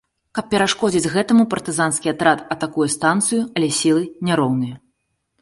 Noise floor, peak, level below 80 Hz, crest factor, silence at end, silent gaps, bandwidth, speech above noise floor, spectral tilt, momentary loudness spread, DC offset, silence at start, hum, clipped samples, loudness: -71 dBFS; -2 dBFS; -56 dBFS; 18 dB; 0.65 s; none; 11.5 kHz; 52 dB; -4 dB/octave; 6 LU; under 0.1%; 0.35 s; none; under 0.1%; -19 LUFS